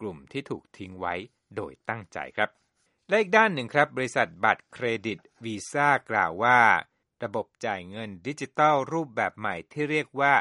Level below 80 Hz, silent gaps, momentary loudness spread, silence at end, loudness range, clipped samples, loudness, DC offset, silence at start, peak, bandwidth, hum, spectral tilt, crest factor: -68 dBFS; none; 16 LU; 0 s; 4 LU; under 0.1%; -26 LUFS; under 0.1%; 0 s; -4 dBFS; 11.5 kHz; none; -5 dB/octave; 22 dB